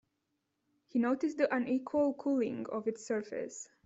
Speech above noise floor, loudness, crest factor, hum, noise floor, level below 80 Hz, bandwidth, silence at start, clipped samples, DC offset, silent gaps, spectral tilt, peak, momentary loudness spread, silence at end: 49 dB; -34 LUFS; 18 dB; none; -83 dBFS; -76 dBFS; 8 kHz; 0.95 s; under 0.1%; under 0.1%; none; -5.5 dB/octave; -16 dBFS; 7 LU; 0.2 s